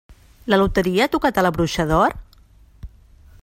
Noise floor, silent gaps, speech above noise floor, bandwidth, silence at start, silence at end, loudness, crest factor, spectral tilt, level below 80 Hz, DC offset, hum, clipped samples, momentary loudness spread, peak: -50 dBFS; none; 32 dB; 16.5 kHz; 0.1 s; 0.55 s; -19 LUFS; 20 dB; -5.5 dB/octave; -36 dBFS; under 0.1%; none; under 0.1%; 4 LU; -2 dBFS